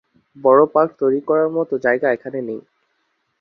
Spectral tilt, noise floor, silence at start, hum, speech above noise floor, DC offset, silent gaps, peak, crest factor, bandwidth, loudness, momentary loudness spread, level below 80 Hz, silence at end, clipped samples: -9 dB/octave; -69 dBFS; 0.35 s; none; 52 dB; under 0.1%; none; -2 dBFS; 16 dB; 6 kHz; -18 LUFS; 14 LU; -64 dBFS; 0.8 s; under 0.1%